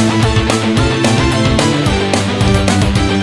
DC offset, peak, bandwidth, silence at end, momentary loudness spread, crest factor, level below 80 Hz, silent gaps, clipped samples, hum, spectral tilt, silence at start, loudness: 0.6%; 0 dBFS; 12 kHz; 0 s; 1 LU; 12 dB; -24 dBFS; none; under 0.1%; none; -5 dB/octave; 0 s; -12 LUFS